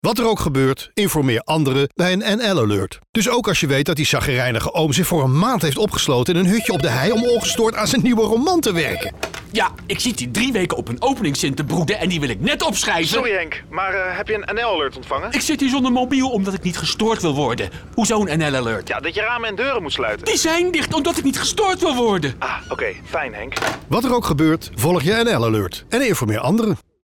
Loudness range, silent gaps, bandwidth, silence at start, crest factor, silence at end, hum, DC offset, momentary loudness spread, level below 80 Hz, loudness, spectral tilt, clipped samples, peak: 3 LU; 3.09-3.13 s; 19 kHz; 0.05 s; 10 dB; 0.25 s; none; under 0.1%; 6 LU; -42 dBFS; -19 LUFS; -4.5 dB/octave; under 0.1%; -8 dBFS